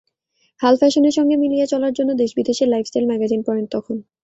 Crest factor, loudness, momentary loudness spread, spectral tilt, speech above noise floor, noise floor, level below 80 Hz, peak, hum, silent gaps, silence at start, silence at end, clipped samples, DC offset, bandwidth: 16 dB; -18 LUFS; 8 LU; -5 dB/octave; 49 dB; -66 dBFS; -62 dBFS; -2 dBFS; none; none; 0.6 s; 0.2 s; under 0.1%; under 0.1%; 8 kHz